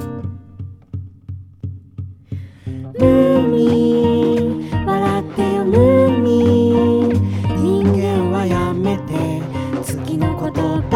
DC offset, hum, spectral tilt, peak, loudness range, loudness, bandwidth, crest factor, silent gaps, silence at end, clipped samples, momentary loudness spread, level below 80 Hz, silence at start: under 0.1%; none; -8 dB/octave; 0 dBFS; 4 LU; -16 LUFS; 15 kHz; 16 dB; none; 0 s; under 0.1%; 19 LU; -40 dBFS; 0 s